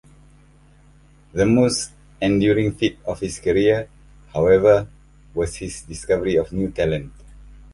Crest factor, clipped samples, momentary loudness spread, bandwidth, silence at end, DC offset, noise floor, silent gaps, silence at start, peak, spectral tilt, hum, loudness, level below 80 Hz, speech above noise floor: 18 dB; under 0.1%; 15 LU; 11.5 kHz; 0.2 s; under 0.1%; -51 dBFS; none; 1.35 s; -2 dBFS; -5.5 dB/octave; none; -20 LUFS; -42 dBFS; 32 dB